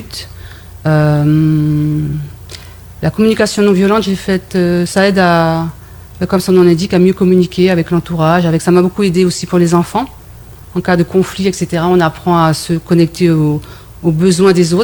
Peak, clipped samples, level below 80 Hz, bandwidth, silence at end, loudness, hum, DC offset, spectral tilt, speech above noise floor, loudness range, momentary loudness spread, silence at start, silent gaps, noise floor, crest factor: 0 dBFS; under 0.1%; -38 dBFS; 19 kHz; 0 s; -12 LUFS; none; under 0.1%; -6.5 dB/octave; 23 dB; 3 LU; 12 LU; 0 s; none; -34 dBFS; 12 dB